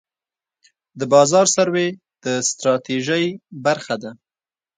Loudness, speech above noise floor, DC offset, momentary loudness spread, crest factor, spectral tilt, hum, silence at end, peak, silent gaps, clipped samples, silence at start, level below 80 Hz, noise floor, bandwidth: -18 LUFS; over 72 dB; under 0.1%; 14 LU; 18 dB; -3.5 dB/octave; none; 0.65 s; -2 dBFS; none; under 0.1%; 0.95 s; -68 dBFS; under -90 dBFS; 9.6 kHz